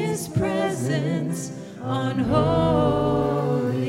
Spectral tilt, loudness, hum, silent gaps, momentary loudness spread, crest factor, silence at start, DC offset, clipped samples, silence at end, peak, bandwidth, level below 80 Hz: -6.5 dB/octave; -23 LUFS; none; none; 9 LU; 14 dB; 0 s; under 0.1%; under 0.1%; 0 s; -8 dBFS; 16 kHz; -44 dBFS